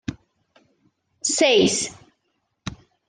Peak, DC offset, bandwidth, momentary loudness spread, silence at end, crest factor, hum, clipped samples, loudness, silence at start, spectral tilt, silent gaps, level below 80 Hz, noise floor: -6 dBFS; under 0.1%; 10.5 kHz; 21 LU; 0.35 s; 20 dB; none; under 0.1%; -19 LUFS; 0.1 s; -2.5 dB/octave; none; -56 dBFS; -73 dBFS